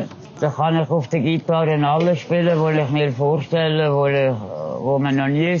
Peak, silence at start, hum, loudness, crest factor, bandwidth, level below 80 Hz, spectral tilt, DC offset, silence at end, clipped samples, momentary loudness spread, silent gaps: -6 dBFS; 0 s; none; -19 LUFS; 12 dB; 7.2 kHz; -64 dBFS; -6 dB/octave; under 0.1%; 0 s; under 0.1%; 6 LU; none